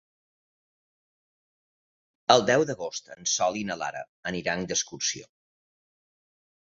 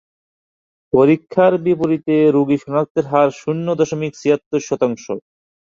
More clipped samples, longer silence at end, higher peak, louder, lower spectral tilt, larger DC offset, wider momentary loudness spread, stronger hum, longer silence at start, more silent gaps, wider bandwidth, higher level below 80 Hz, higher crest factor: neither; first, 1.5 s vs 0.55 s; about the same, -2 dBFS vs 0 dBFS; second, -27 LUFS vs -17 LUFS; second, -2.5 dB/octave vs -7 dB/octave; neither; first, 13 LU vs 7 LU; neither; first, 2.3 s vs 0.95 s; about the same, 4.09-4.23 s vs 2.90-2.95 s, 4.46-4.51 s; about the same, 7.8 kHz vs 7.6 kHz; second, -66 dBFS vs -60 dBFS; first, 28 dB vs 16 dB